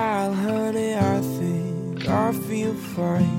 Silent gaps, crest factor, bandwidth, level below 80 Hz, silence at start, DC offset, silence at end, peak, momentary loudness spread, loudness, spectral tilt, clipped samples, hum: none; 14 dB; 17 kHz; -56 dBFS; 0 s; under 0.1%; 0 s; -8 dBFS; 5 LU; -24 LUFS; -7 dB/octave; under 0.1%; none